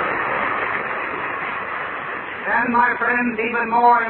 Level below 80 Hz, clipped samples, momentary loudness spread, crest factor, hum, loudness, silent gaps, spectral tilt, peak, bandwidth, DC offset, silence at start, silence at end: -56 dBFS; under 0.1%; 9 LU; 18 dB; none; -20 LUFS; none; -8.5 dB/octave; -2 dBFS; 4.2 kHz; under 0.1%; 0 s; 0 s